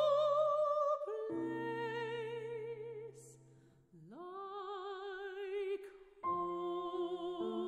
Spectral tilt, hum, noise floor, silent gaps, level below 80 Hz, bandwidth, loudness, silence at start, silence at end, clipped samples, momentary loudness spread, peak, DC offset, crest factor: -6 dB/octave; none; -65 dBFS; none; -80 dBFS; 10.5 kHz; -39 LUFS; 0 s; 0 s; under 0.1%; 17 LU; -24 dBFS; under 0.1%; 16 dB